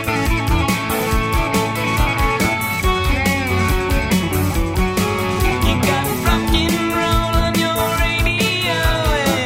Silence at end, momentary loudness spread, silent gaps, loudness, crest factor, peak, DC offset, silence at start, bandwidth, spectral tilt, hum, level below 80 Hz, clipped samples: 0 s; 2 LU; none; -17 LUFS; 16 dB; -2 dBFS; under 0.1%; 0 s; 16.5 kHz; -4.5 dB/octave; none; -24 dBFS; under 0.1%